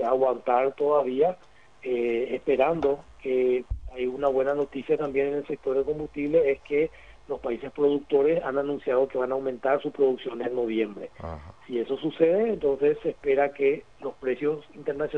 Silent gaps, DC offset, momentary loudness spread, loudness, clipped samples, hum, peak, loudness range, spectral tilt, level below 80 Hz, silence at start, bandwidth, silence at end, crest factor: none; 0.2%; 10 LU; -26 LUFS; under 0.1%; none; -8 dBFS; 2 LU; -7.5 dB/octave; -50 dBFS; 0 s; 6 kHz; 0 s; 18 dB